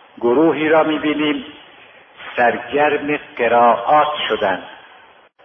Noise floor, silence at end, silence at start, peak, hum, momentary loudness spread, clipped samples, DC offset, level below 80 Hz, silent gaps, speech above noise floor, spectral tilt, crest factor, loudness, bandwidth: -47 dBFS; 0.65 s; 0.2 s; -2 dBFS; none; 12 LU; under 0.1%; under 0.1%; -58 dBFS; none; 31 dB; -7.5 dB/octave; 16 dB; -16 LUFS; 5.6 kHz